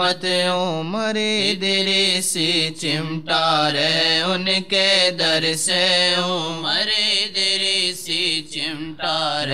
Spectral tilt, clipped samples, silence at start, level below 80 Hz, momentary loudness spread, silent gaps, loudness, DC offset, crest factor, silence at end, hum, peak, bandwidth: -2.5 dB/octave; under 0.1%; 0 s; -64 dBFS; 7 LU; none; -18 LUFS; 0.7%; 16 dB; 0 s; none; -4 dBFS; 16 kHz